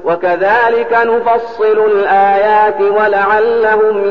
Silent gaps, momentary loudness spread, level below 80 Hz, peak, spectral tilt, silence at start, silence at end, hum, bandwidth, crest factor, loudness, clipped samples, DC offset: none; 3 LU; -50 dBFS; -2 dBFS; -6.5 dB/octave; 0 s; 0 s; none; 5.6 kHz; 10 dB; -11 LUFS; under 0.1%; 1%